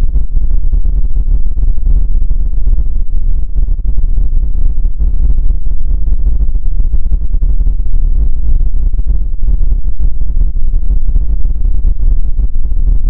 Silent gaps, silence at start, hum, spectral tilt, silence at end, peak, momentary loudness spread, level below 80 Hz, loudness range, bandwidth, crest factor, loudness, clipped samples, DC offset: none; 0 s; none; -12.5 dB/octave; 0 s; 0 dBFS; 2 LU; -10 dBFS; 1 LU; 0.8 kHz; 6 dB; -17 LUFS; under 0.1%; under 0.1%